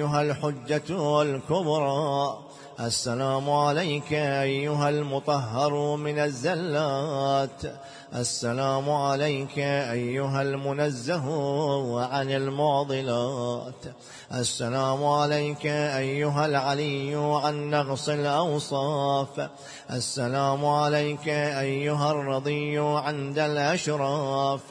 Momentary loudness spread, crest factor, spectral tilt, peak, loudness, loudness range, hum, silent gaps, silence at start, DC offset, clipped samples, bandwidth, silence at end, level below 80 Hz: 6 LU; 16 dB; -5 dB/octave; -10 dBFS; -26 LUFS; 2 LU; none; none; 0 s; under 0.1%; under 0.1%; 10.5 kHz; 0 s; -64 dBFS